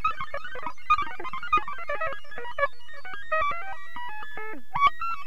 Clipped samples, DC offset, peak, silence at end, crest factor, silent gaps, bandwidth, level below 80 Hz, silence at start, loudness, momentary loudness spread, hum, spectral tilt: under 0.1%; 4%; -10 dBFS; 0 s; 20 dB; none; 14 kHz; -52 dBFS; 0 s; -29 LUFS; 14 LU; none; -4 dB/octave